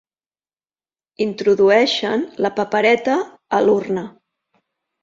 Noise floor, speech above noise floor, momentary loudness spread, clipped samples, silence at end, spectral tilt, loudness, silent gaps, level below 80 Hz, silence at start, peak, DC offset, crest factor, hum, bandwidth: under -90 dBFS; over 73 dB; 11 LU; under 0.1%; 0.95 s; -5 dB/octave; -18 LUFS; none; -64 dBFS; 1.2 s; -2 dBFS; under 0.1%; 18 dB; none; 7.6 kHz